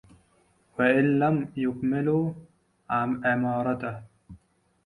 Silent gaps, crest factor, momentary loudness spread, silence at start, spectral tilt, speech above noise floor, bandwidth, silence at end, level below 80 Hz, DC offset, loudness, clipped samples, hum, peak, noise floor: none; 18 dB; 13 LU; 0.8 s; -9 dB/octave; 40 dB; 11 kHz; 0.5 s; -60 dBFS; under 0.1%; -26 LUFS; under 0.1%; none; -10 dBFS; -65 dBFS